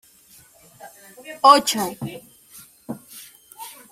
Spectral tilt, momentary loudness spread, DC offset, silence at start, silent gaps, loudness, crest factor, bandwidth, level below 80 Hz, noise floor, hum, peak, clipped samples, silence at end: -3 dB/octave; 28 LU; under 0.1%; 0.85 s; none; -17 LUFS; 24 dB; 16 kHz; -66 dBFS; -52 dBFS; none; 0 dBFS; under 0.1%; 0.25 s